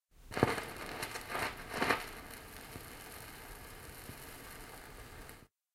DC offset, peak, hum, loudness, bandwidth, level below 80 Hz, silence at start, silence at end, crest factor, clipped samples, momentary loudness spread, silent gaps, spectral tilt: under 0.1%; -10 dBFS; none; -40 LUFS; 16.5 kHz; -58 dBFS; 0.15 s; 0.3 s; 32 dB; under 0.1%; 17 LU; none; -4 dB/octave